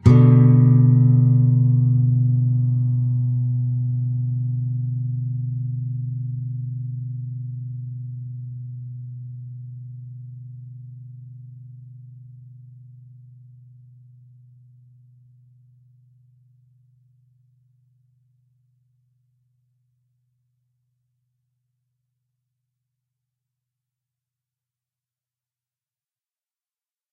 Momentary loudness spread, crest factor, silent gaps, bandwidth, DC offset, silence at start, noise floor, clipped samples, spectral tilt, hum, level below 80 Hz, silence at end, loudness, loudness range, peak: 26 LU; 22 dB; none; 2.4 kHz; under 0.1%; 0.05 s; under -90 dBFS; under 0.1%; -12 dB/octave; none; -52 dBFS; 14.4 s; -20 LUFS; 25 LU; 0 dBFS